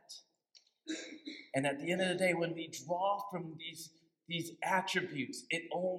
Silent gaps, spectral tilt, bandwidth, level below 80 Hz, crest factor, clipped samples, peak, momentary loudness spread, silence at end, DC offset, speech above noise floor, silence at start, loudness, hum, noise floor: none; -4 dB/octave; 16.5 kHz; -86 dBFS; 20 dB; under 0.1%; -18 dBFS; 16 LU; 0 s; under 0.1%; 32 dB; 0.1 s; -37 LUFS; none; -69 dBFS